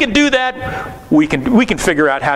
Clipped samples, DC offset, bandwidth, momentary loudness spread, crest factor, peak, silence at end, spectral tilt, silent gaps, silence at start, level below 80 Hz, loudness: under 0.1%; under 0.1%; 14 kHz; 11 LU; 14 dB; 0 dBFS; 0 s; -4.5 dB/octave; none; 0 s; -36 dBFS; -14 LUFS